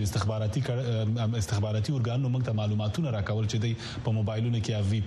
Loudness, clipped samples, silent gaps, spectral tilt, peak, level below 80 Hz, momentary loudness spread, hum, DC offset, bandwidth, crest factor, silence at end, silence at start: -29 LUFS; under 0.1%; none; -6.5 dB/octave; -16 dBFS; -50 dBFS; 2 LU; none; under 0.1%; 12.5 kHz; 12 dB; 0 s; 0 s